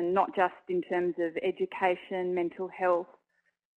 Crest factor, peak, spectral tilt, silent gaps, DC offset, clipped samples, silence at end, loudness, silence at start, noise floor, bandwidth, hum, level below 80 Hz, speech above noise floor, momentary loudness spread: 18 dB; -12 dBFS; -7.5 dB/octave; none; under 0.1%; under 0.1%; 0.7 s; -30 LUFS; 0 s; -76 dBFS; 4.3 kHz; none; -74 dBFS; 46 dB; 4 LU